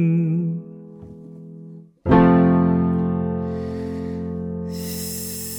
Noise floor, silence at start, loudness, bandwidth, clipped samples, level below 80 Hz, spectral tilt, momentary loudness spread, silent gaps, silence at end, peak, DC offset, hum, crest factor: -41 dBFS; 0 s; -21 LUFS; over 20 kHz; under 0.1%; -42 dBFS; -7 dB/octave; 25 LU; none; 0 s; -2 dBFS; under 0.1%; none; 18 dB